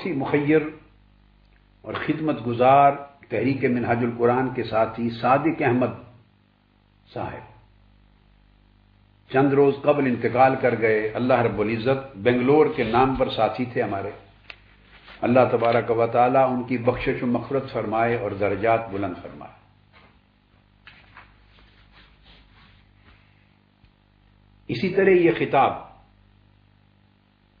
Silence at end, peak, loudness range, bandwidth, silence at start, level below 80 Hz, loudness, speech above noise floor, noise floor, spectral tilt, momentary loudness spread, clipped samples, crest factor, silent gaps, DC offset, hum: 1.75 s; -4 dBFS; 8 LU; 5.2 kHz; 0 s; -52 dBFS; -22 LUFS; 39 dB; -60 dBFS; -10 dB/octave; 13 LU; under 0.1%; 20 dB; none; under 0.1%; 50 Hz at -55 dBFS